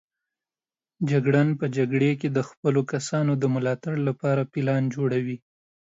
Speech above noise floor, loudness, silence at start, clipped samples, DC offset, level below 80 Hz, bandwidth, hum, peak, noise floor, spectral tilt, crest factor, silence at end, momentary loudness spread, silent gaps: over 66 dB; -25 LUFS; 1 s; under 0.1%; under 0.1%; -68 dBFS; 8 kHz; none; -8 dBFS; under -90 dBFS; -7.5 dB/octave; 16 dB; 0.6 s; 5 LU; 2.57-2.63 s